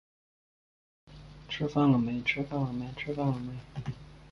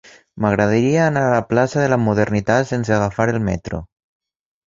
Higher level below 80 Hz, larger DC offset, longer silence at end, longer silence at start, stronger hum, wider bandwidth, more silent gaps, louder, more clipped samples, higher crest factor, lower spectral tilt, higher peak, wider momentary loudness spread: second, -56 dBFS vs -42 dBFS; neither; second, 0 s vs 0.8 s; first, 1.1 s vs 0.35 s; neither; about the same, 7 kHz vs 7.6 kHz; neither; second, -31 LUFS vs -18 LUFS; neither; about the same, 20 dB vs 16 dB; about the same, -7.5 dB/octave vs -7 dB/octave; second, -12 dBFS vs -2 dBFS; first, 17 LU vs 7 LU